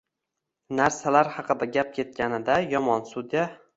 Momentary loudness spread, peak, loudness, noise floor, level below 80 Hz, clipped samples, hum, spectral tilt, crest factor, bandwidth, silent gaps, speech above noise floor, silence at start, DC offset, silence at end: 7 LU; -4 dBFS; -25 LUFS; -84 dBFS; -62 dBFS; under 0.1%; none; -5 dB/octave; 22 dB; 8 kHz; none; 59 dB; 0.7 s; under 0.1%; 0.2 s